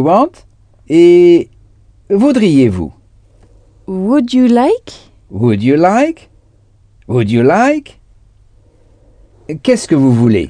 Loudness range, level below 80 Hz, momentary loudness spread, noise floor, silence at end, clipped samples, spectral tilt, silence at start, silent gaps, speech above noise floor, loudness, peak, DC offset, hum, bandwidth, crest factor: 5 LU; -44 dBFS; 13 LU; -48 dBFS; 0 s; 0.1%; -7 dB/octave; 0 s; none; 38 dB; -11 LUFS; 0 dBFS; under 0.1%; none; 10 kHz; 12 dB